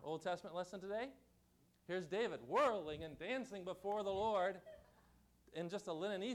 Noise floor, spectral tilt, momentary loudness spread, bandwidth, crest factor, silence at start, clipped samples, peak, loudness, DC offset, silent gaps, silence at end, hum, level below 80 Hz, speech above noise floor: -74 dBFS; -5 dB/octave; 11 LU; 14.5 kHz; 16 dB; 0 s; under 0.1%; -28 dBFS; -43 LUFS; under 0.1%; none; 0 s; 60 Hz at -75 dBFS; -72 dBFS; 32 dB